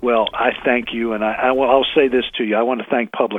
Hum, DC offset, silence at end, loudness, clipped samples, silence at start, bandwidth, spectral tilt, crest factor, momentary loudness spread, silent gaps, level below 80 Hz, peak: none; under 0.1%; 0 s; -17 LUFS; under 0.1%; 0 s; 3.9 kHz; -6.5 dB/octave; 18 dB; 6 LU; none; -48 dBFS; 0 dBFS